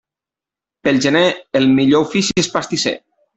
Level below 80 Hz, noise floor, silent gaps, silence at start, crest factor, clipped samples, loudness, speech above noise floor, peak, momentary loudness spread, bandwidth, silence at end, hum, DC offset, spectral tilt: -54 dBFS; -88 dBFS; none; 0.85 s; 14 dB; under 0.1%; -15 LUFS; 73 dB; -2 dBFS; 7 LU; 8.4 kHz; 0.4 s; none; under 0.1%; -4.5 dB/octave